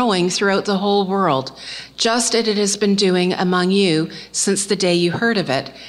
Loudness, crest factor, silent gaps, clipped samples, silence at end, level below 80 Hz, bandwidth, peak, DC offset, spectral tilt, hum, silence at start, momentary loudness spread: -17 LUFS; 14 dB; none; under 0.1%; 0 s; -58 dBFS; 13.5 kHz; -4 dBFS; under 0.1%; -4 dB/octave; none; 0 s; 6 LU